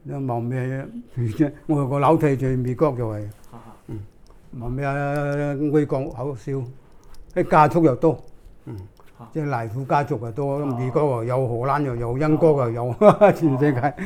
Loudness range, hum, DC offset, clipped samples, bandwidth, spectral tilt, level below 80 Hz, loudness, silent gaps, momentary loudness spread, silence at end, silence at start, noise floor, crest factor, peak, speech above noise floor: 7 LU; none; under 0.1%; under 0.1%; 14.5 kHz; -9 dB/octave; -46 dBFS; -21 LUFS; none; 17 LU; 0 s; 0.05 s; -41 dBFS; 22 dB; 0 dBFS; 20 dB